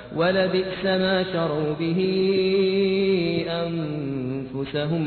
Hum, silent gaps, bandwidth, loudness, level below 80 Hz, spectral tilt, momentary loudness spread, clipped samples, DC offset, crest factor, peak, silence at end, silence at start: none; none; 4.5 kHz; -23 LUFS; -54 dBFS; -9.5 dB/octave; 8 LU; under 0.1%; under 0.1%; 14 dB; -8 dBFS; 0 s; 0 s